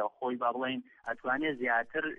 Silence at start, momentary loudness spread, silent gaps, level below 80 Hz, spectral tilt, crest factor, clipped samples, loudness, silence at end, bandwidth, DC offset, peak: 0 s; 8 LU; none; -72 dBFS; -6.5 dB/octave; 16 dB; under 0.1%; -33 LUFS; 0.05 s; 7 kHz; under 0.1%; -18 dBFS